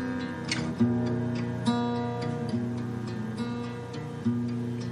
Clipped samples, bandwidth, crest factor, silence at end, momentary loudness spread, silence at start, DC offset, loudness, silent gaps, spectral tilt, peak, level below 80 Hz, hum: under 0.1%; 11 kHz; 16 dB; 0 s; 7 LU; 0 s; under 0.1%; -31 LUFS; none; -6.5 dB/octave; -14 dBFS; -60 dBFS; none